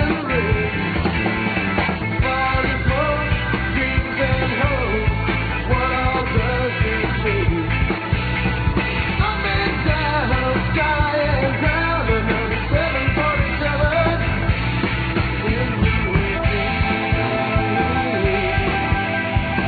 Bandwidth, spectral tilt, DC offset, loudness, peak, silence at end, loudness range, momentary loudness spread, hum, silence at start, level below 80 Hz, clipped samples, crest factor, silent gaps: 4.8 kHz; -9 dB/octave; under 0.1%; -19 LUFS; -6 dBFS; 0 s; 1 LU; 2 LU; none; 0 s; -26 dBFS; under 0.1%; 14 dB; none